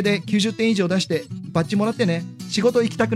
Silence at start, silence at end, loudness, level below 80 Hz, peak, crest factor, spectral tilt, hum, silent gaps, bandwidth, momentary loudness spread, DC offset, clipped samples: 0 s; 0 s; -21 LUFS; -58 dBFS; -6 dBFS; 14 dB; -5.5 dB/octave; none; none; 14 kHz; 7 LU; under 0.1%; under 0.1%